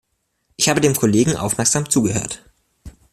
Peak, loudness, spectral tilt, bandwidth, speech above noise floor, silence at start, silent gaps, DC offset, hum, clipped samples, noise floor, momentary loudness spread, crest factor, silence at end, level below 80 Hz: -2 dBFS; -17 LUFS; -4 dB/octave; 16 kHz; 50 dB; 0.6 s; none; under 0.1%; none; under 0.1%; -67 dBFS; 8 LU; 18 dB; 0.25 s; -48 dBFS